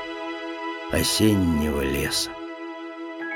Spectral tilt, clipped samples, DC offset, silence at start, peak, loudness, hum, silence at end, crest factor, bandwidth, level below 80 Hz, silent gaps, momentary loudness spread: -4 dB/octave; under 0.1%; under 0.1%; 0 s; -8 dBFS; -24 LUFS; none; 0 s; 18 dB; 19 kHz; -40 dBFS; none; 16 LU